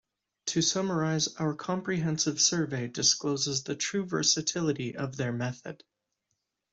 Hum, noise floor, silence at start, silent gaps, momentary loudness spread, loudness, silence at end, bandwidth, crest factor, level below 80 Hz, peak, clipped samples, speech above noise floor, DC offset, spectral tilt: none; -82 dBFS; 0.45 s; none; 9 LU; -28 LUFS; 1 s; 8.2 kHz; 20 dB; -68 dBFS; -10 dBFS; under 0.1%; 52 dB; under 0.1%; -3 dB/octave